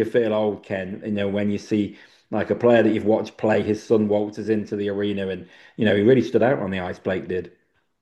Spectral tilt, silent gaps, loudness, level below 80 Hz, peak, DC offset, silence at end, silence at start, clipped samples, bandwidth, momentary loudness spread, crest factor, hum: -7.5 dB/octave; none; -22 LUFS; -62 dBFS; -4 dBFS; under 0.1%; 0.55 s; 0 s; under 0.1%; 8.8 kHz; 12 LU; 18 dB; none